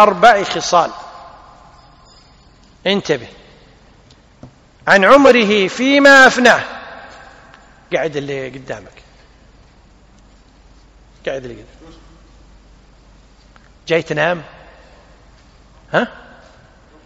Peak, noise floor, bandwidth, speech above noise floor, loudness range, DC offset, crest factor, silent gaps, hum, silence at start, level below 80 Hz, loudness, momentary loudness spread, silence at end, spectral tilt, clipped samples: 0 dBFS; -47 dBFS; 13 kHz; 35 dB; 23 LU; under 0.1%; 18 dB; none; none; 0 s; -48 dBFS; -13 LUFS; 23 LU; 0.95 s; -4 dB/octave; 0.3%